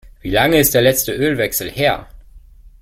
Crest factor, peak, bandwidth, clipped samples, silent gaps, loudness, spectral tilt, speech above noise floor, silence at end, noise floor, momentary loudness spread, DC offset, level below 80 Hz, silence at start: 16 dB; 0 dBFS; 16.5 kHz; under 0.1%; none; -15 LUFS; -3.5 dB/octave; 26 dB; 0.45 s; -42 dBFS; 7 LU; under 0.1%; -38 dBFS; 0.05 s